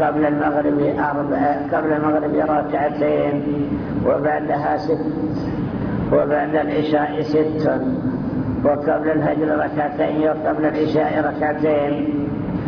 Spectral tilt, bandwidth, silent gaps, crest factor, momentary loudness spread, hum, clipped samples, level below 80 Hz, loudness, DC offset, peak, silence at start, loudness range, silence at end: -9.5 dB/octave; 5.4 kHz; none; 14 dB; 5 LU; none; under 0.1%; -44 dBFS; -20 LUFS; under 0.1%; -6 dBFS; 0 s; 1 LU; 0 s